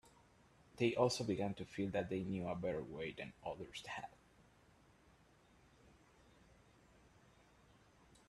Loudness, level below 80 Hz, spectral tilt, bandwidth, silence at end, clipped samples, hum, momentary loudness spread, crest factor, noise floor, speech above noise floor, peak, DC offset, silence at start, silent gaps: -42 LUFS; -70 dBFS; -5.5 dB/octave; 13 kHz; 4.2 s; under 0.1%; none; 13 LU; 24 dB; -69 dBFS; 28 dB; -20 dBFS; under 0.1%; 0.05 s; none